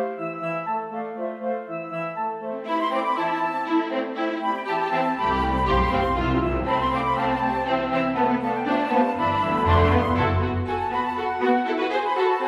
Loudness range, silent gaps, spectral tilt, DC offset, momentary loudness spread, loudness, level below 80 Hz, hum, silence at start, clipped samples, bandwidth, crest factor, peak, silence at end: 5 LU; none; -7.5 dB/octave; under 0.1%; 8 LU; -24 LUFS; -38 dBFS; none; 0 s; under 0.1%; 12 kHz; 16 dB; -6 dBFS; 0 s